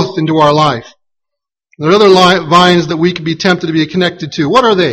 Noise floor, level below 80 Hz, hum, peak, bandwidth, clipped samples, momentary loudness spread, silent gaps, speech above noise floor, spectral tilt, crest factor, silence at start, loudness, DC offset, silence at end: -79 dBFS; -46 dBFS; none; 0 dBFS; 11 kHz; 0.6%; 8 LU; none; 70 dB; -5.5 dB/octave; 10 dB; 0 s; -10 LUFS; under 0.1%; 0 s